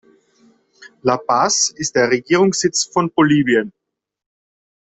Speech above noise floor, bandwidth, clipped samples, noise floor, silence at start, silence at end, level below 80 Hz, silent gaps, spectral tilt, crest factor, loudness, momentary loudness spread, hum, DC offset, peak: 39 dB; 8.4 kHz; under 0.1%; -55 dBFS; 0.8 s; 1.2 s; -58 dBFS; none; -3.5 dB/octave; 16 dB; -16 LUFS; 5 LU; none; under 0.1%; -2 dBFS